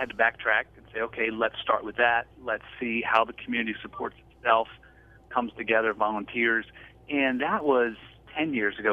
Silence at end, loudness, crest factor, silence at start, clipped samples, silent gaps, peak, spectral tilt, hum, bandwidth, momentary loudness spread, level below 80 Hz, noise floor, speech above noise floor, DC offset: 0 s; -27 LUFS; 22 dB; 0 s; under 0.1%; none; -6 dBFS; -6.5 dB/octave; none; 7.2 kHz; 11 LU; -58 dBFS; -50 dBFS; 23 dB; under 0.1%